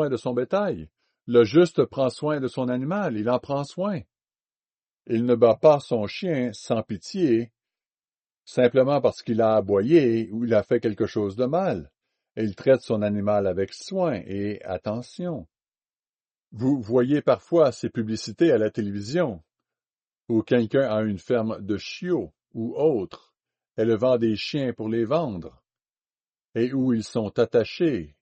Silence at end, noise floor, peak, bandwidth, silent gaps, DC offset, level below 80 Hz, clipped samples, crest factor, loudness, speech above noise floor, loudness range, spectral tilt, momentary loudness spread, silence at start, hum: 0.15 s; under -90 dBFS; -4 dBFS; 8.4 kHz; 4.56-4.60 s, 7.87-7.91 s, 15.99-16.03 s, 16.15-16.19 s; under 0.1%; -62 dBFS; under 0.1%; 20 dB; -24 LUFS; over 67 dB; 5 LU; -7 dB/octave; 11 LU; 0 s; none